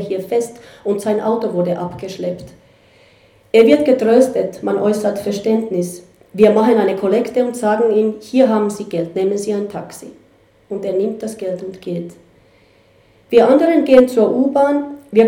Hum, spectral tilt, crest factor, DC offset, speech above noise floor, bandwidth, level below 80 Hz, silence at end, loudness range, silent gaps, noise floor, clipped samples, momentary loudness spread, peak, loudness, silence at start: none; -6 dB/octave; 16 dB; under 0.1%; 36 dB; 16.5 kHz; -56 dBFS; 0 s; 8 LU; none; -51 dBFS; under 0.1%; 15 LU; 0 dBFS; -16 LUFS; 0 s